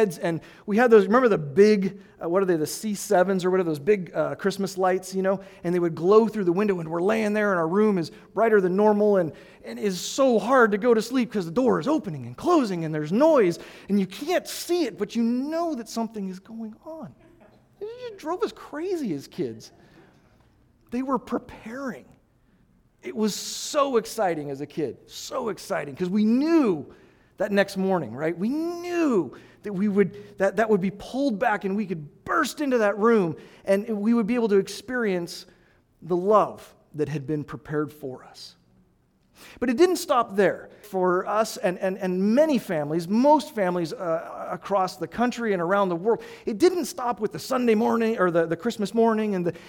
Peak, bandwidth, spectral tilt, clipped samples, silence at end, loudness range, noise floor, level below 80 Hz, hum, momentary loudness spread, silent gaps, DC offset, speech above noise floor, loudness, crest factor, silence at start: -4 dBFS; 18.5 kHz; -5.5 dB/octave; under 0.1%; 0 s; 10 LU; -64 dBFS; -62 dBFS; none; 14 LU; none; under 0.1%; 40 dB; -24 LUFS; 20 dB; 0 s